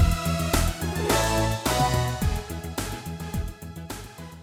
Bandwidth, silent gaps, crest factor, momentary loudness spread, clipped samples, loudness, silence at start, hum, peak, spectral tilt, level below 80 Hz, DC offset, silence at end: over 20 kHz; none; 18 dB; 14 LU; under 0.1%; -26 LUFS; 0 s; none; -8 dBFS; -4.5 dB/octave; -32 dBFS; under 0.1%; 0 s